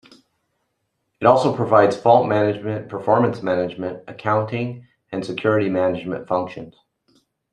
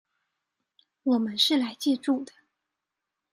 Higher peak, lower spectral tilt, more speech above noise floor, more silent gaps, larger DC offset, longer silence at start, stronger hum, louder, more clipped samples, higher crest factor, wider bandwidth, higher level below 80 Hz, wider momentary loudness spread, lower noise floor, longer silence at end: first, 0 dBFS vs -10 dBFS; first, -7.5 dB/octave vs -3.5 dB/octave; second, 54 dB vs 60 dB; neither; neither; first, 1.2 s vs 1.05 s; neither; first, -20 LUFS vs -26 LUFS; neither; about the same, 20 dB vs 20 dB; second, 10.5 kHz vs 15 kHz; first, -62 dBFS vs -78 dBFS; first, 14 LU vs 9 LU; second, -74 dBFS vs -86 dBFS; second, 0.8 s vs 1.05 s